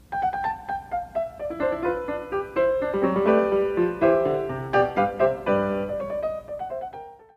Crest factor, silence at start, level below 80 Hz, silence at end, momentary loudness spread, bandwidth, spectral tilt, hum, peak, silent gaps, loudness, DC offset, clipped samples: 18 dB; 0.1 s; -52 dBFS; 0.2 s; 11 LU; 7.2 kHz; -8 dB/octave; none; -8 dBFS; none; -25 LUFS; under 0.1%; under 0.1%